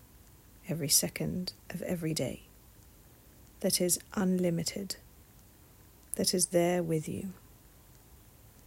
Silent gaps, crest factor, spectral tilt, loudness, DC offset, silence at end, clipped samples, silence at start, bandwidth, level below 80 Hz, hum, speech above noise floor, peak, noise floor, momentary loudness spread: none; 24 dB; -4 dB/octave; -31 LUFS; under 0.1%; 1.2 s; under 0.1%; 0 s; 16 kHz; -60 dBFS; none; 26 dB; -10 dBFS; -58 dBFS; 14 LU